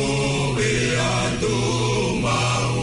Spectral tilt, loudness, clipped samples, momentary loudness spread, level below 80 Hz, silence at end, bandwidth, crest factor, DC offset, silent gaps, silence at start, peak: -4.5 dB/octave; -21 LUFS; under 0.1%; 1 LU; -38 dBFS; 0 s; 11 kHz; 10 dB; under 0.1%; none; 0 s; -10 dBFS